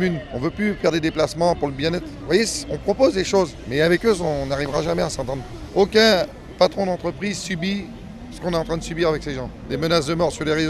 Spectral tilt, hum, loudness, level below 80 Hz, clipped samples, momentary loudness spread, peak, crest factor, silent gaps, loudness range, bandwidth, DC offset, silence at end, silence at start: -5 dB/octave; none; -21 LUFS; -40 dBFS; under 0.1%; 11 LU; -2 dBFS; 18 dB; none; 4 LU; 14.5 kHz; under 0.1%; 0 s; 0 s